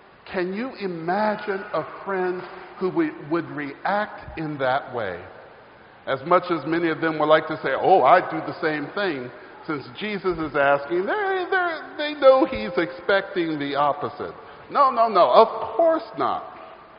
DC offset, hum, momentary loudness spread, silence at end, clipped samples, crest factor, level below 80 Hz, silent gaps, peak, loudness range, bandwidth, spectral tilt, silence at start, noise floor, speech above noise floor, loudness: under 0.1%; none; 15 LU; 0.15 s; under 0.1%; 22 dB; -58 dBFS; none; 0 dBFS; 6 LU; 5.4 kHz; -3.5 dB/octave; 0.25 s; -48 dBFS; 26 dB; -22 LUFS